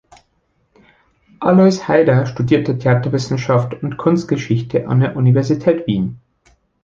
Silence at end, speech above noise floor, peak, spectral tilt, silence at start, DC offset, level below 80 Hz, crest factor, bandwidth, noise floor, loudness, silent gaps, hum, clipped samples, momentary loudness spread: 0.65 s; 48 dB; 0 dBFS; -8 dB/octave; 1.4 s; under 0.1%; -50 dBFS; 16 dB; 7.4 kHz; -63 dBFS; -16 LUFS; none; none; under 0.1%; 7 LU